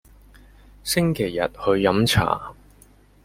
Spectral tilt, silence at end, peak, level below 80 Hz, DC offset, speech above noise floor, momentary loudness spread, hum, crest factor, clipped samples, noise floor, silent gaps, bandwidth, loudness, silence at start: -5 dB/octave; 0.7 s; -2 dBFS; -44 dBFS; under 0.1%; 32 dB; 10 LU; 50 Hz at -45 dBFS; 20 dB; under 0.1%; -53 dBFS; none; 16.5 kHz; -21 LUFS; 0.85 s